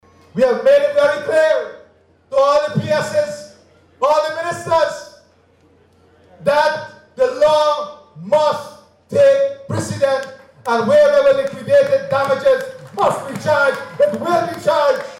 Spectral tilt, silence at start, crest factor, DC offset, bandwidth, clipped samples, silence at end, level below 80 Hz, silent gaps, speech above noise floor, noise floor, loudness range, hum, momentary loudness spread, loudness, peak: -5 dB/octave; 0.35 s; 10 dB; under 0.1%; 13 kHz; under 0.1%; 0 s; -58 dBFS; none; 38 dB; -53 dBFS; 5 LU; none; 13 LU; -16 LUFS; -6 dBFS